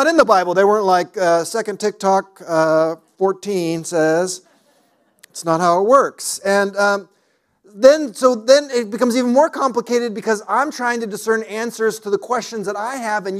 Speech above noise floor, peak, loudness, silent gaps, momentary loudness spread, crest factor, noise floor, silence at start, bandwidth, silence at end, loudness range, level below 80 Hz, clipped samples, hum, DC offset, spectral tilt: 46 dB; 0 dBFS; -17 LUFS; none; 9 LU; 18 dB; -63 dBFS; 0 s; 15 kHz; 0 s; 4 LU; -64 dBFS; under 0.1%; none; under 0.1%; -4 dB/octave